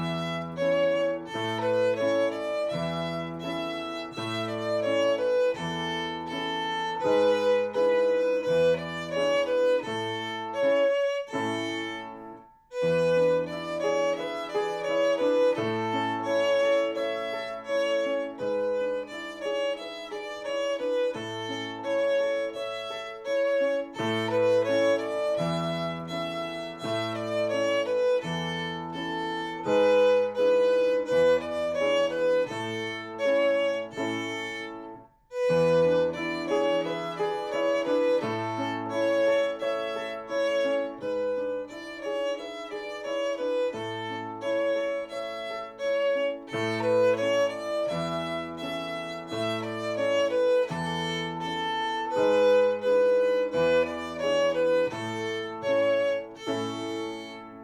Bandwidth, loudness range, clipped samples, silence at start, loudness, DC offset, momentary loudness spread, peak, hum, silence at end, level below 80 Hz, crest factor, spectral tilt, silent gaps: 12 kHz; 5 LU; under 0.1%; 0 s; -27 LUFS; under 0.1%; 10 LU; -12 dBFS; none; 0 s; -64 dBFS; 14 dB; -5 dB/octave; none